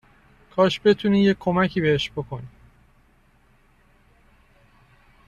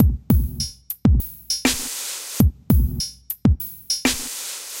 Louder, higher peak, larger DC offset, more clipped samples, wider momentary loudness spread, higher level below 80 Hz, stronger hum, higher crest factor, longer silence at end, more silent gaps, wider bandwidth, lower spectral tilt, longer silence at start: about the same, -21 LUFS vs -22 LUFS; second, -6 dBFS vs -2 dBFS; neither; neither; first, 14 LU vs 8 LU; second, -54 dBFS vs -26 dBFS; neither; about the same, 20 dB vs 20 dB; first, 2.8 s vs 0 s; neither; second, 7.6 kHz vs 17 kHz; first, -7 dB/octave vs -4.5 dB/octave; first, 0.55 s vs 0 s